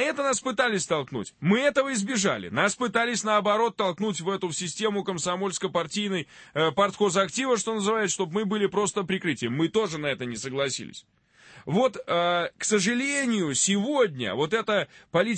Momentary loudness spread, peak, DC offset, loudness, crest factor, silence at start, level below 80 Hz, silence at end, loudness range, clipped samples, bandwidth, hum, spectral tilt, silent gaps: 6 LU; -8 dBFS; under 0.1%; -26 LUFS; 18 dB; 0 s; -66 dBFS; 0 s; 3 LU; under 0.1%; 8.8 kHz; none; -3.5 dB/octave; none